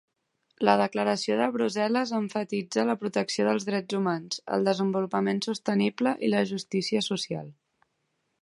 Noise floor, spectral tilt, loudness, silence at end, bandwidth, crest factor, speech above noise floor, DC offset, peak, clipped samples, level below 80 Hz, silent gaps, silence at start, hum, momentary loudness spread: -77 dBFS; -5 dB/octave; -27 LUFS; 0.9 s; 11.5 kHz; 22 dB; 50 dB; under 0.1%; -6 dBFS; under 0.1%; -76 dBFS; none; 0.6 s; none; 5 LU